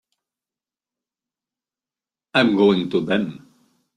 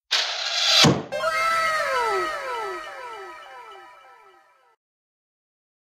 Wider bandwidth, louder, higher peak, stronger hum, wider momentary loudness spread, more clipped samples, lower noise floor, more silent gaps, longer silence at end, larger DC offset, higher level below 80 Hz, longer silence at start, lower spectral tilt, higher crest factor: second, 9.6 kHz vs 16 kHz; about the same, -19 LUFS vs -21 LUFS; about the same, -2 dBFS vs -4 dBFS; neither; second, 7 LU vs 23 LU; neither; first, under -90 dBFS vs -56 dBFS; neither; second, 0.6 s vs 2.05 s; neither; about the same, -64 dBFS vs -60 dBFS; first, 2.35 s vs 0.1 s; first, -7 dB/octave vs -2.5 dB/octave; about the same, 20 dB vs 20 dB